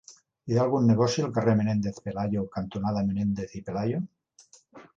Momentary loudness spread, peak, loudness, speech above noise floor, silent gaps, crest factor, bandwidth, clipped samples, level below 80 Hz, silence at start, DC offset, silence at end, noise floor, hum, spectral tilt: 11 LU; -10 dBFS; -27 LUFS; 32 dB; none; 16 dB; 7.8 kHz; under 0.1%; -56 dBFS; 0.1 s; under 0.1%; 0.15 s; -58 dBFS; none; -7 dB/octave